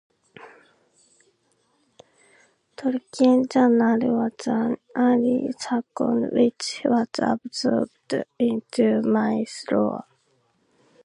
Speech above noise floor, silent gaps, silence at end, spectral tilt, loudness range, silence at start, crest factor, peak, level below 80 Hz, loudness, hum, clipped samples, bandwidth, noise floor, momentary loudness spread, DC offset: 45 dB; none; 1.05 s; -5.5 dB/octave; 4 LU; 0.4 s; 18 dB; -6 dBFS; -68 dBFS; -23 LUFS; none; under 0.1%; 11 kHz; -67 dBFS; 9 LU; under 0.1%